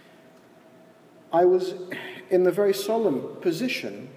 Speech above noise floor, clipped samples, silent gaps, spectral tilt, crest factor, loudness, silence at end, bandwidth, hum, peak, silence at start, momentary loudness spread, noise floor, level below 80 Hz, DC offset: 29 dB; under 0.1%; none; -5.5 dB/octave; 16 dB; -24 LUFS; 0 s; 16 kHz; none; -10 dBFS; 1.3 s; 12 LU; -53 dBFS; -82 dBFS; under 0.1%